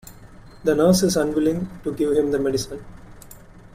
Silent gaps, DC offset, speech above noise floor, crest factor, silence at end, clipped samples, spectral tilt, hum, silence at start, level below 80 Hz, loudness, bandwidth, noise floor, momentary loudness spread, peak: none; under 0.1%; 23 dB; 18 dB; 0.15 s; under 0.1%; -5.5 dB/octave; none; 0.05 s; -46 dBFS; -21 LUFS; 16 kHz; -44 dBFS; 12 LU; -6 dBFS